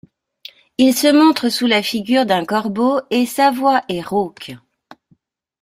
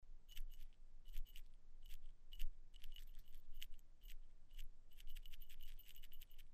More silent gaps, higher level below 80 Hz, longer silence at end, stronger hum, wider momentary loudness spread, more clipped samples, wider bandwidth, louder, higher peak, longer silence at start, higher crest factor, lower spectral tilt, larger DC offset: neither; second, -60 dBFS vs -52 dBFS; first, 1.05 s vs 0 s; neither; about the same, 9 LU vs 8 LU; neither; first, 16 kHz vs 14.5 kHz; first, -16 LUFS vs -62 LUFS; first, -2 dBFS vs -30 dBFS; first, 0.8 s vs 0 s; about the same, 16 dB vs 18 dB; first, -4 dB/octave vs -2.5 dB/octave; neither